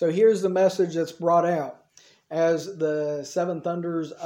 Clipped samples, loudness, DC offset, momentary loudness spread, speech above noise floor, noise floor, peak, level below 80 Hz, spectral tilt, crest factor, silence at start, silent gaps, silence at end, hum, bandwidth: under 0.1%; -24 LUFS; under 0.1%; 9 LU; 33 dB; -57 dBFS; -8 dBFS; -74 dBFS; -6 dB/octave; 16 dB; 0 s; none; 0 s; none; 16 kHz